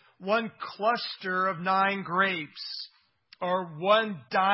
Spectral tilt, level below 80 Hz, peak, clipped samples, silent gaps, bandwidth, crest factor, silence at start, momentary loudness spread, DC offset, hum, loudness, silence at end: -8.5 dB/octave; -80 dBFS; -10 dBFS; under 0.1%; none; 5.8 kHz; 18 dB; 0.2 s; 12 LU; under 0.1%; none; -28 LUFS; 0 s